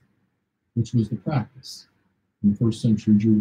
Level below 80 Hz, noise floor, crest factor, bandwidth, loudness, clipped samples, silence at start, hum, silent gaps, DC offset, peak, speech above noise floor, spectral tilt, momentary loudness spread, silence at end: -58 dBFS; -74 dBFS; 16 dB; 10 kHz; -23 LUFS; under 0.1%; 0.75 s; none; none; under 0.1%; -8 dBFS; 53 dB; -8 dB/octave; 19 LU; 0 s